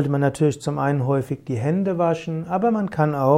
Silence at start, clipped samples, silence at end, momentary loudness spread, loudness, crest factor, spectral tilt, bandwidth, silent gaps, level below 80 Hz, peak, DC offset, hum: 0 s; under 0.1%; 0 s; 5 LU; -22 LUFS; 16 dB; -8 dB/octave; 13.5 kHz; none; -56 dBFS; -4 dBFS; under 0.1%; none